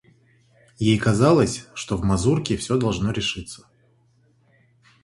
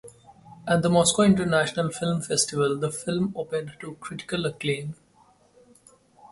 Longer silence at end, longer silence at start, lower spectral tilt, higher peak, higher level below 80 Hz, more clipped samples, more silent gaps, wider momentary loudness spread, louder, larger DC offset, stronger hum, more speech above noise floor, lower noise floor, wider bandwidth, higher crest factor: first, 1.45 s vs 0.05 s; first, 0.8 s vs 0.05 s; about the same, -5.5 dB/octave vs -4.5 dB/octave; about the same, -4 dBFS vs -6 dBFS; first, -44 dBFS vs -58 dBFS; neither; neither; second, 14 LU vs 17 LU; first, -21 LUFS vs -24 LUFS; neither; neither; first, 40 dB vs 35 dB; about the same, -61 dBFS vs -59 dBFS; about the same, 11.5 kHz vs 11.5 kHz; about the same, 20 dB vs 20 dB